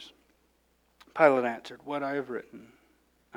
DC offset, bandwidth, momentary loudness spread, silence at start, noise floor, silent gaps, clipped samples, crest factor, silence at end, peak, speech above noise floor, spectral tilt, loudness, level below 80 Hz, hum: under 0.1%; 12 kHz; 21 LU; 0 s; -69 dBFS; none; under 0.1%; 24 dB; 0.75 s; -8 dBFS; 41 dB; -6 dB/octave; -28 LUFS; -74 dBFS; none